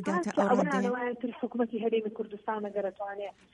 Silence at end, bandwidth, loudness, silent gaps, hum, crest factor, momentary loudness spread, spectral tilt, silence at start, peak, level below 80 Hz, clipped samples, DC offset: 0.25 s; 11 kHz; -31 LUFS; none; none; 18 dB; 11 LU; -6.5 dB/octave; 0 s; -14 dBFS; -74 dBFS; under 0.1%; under 0.1%